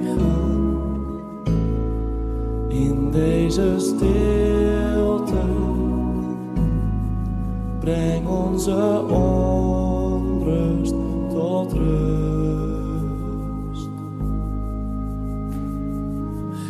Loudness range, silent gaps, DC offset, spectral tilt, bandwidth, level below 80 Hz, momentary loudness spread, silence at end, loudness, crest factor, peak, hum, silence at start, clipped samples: 6 LU; none; under 0.1%; -8 dB/octave; 13.5 kHz; -26 dBFS; 9 LU; 0 s; -22 LUFS; 14 dB; -6 dBFS; none; 0 s; under 0.1%